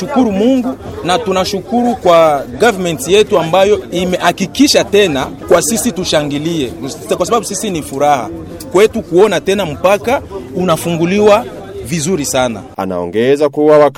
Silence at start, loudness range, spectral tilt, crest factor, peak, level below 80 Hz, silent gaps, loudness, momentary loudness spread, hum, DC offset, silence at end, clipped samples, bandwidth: 0 s; 3 LU; -4.5 dB/octave; 12 dB; 0 dBFS; -40 dBFS; none; -12 LUFS; 10 LU; none; under 0.1%; 0.05 s; under 0.1%; 16.5 kHz